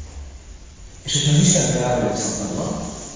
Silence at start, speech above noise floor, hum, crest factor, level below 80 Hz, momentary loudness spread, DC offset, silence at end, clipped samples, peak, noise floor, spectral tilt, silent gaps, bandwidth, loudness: 0 s; 21 dB; none; 18 dB; -40 dBFS; 22 LU; under 0.1%; 0 s; under 0.1%; -4 dBFS; -40 dBFS; -4 dB/octave; none; 7.8 kHz; -19 LUFS